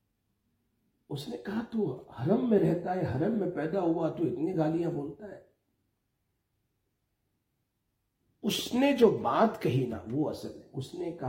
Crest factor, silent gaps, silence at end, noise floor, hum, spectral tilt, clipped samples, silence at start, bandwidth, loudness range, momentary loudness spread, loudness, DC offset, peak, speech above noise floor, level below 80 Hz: 22 dB; none; 0 s; -80 dBFS; none; -6.5 dB/octave; under 0.1%; 1.1 s; 16.5 kHz; 9 LU; 16 LU; -30 LUFS; under 0.1%; -10 dBFS; 50 dB; -66 dBFS